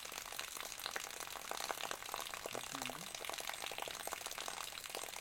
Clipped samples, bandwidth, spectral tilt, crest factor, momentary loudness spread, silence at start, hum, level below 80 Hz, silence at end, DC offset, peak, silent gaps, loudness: under 0.1%; 17 kHz; -0.5 dB/octave; 26 dB; 2 LU; 0 s; none; -72 dBFS; 0 s; under 0.1%; -20 dBFS; none; -44 LUFS